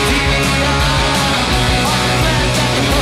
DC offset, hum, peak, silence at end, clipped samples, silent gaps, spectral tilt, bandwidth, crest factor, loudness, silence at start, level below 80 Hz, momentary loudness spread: under 0.1%; none; -4 dBFS; 0 s; under 0.1%; none; -4 dB/octave; 16 kHz; 10 dB; -13 LUFS; 0 s; -22 dBFS; 1 LU